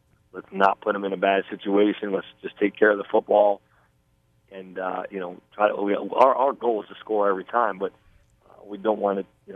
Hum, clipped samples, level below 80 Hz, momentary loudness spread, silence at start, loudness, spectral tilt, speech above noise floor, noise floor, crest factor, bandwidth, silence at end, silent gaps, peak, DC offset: none; under 0.1%; -68 dBFS; 15 LU; 0.35 s; -23 LUFS; -7.5 dB/octave; 41 dB; -65 dBFS; 20 dB; 6.4 kHz; 0 s; none; -4 dBFS; under 0.1%